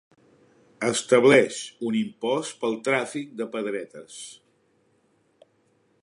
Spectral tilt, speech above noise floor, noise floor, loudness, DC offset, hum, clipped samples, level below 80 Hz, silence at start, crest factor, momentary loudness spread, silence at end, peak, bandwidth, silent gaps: -4 dB/octave; 42 dB; -66 dBFS; -24 LUFS; under 0.1%; none; under 0.1%; -76 dBFS; 0.8 s; 22 dB; 22 LU; 1.7 s; -4 dBFS; 11.5 kHz; none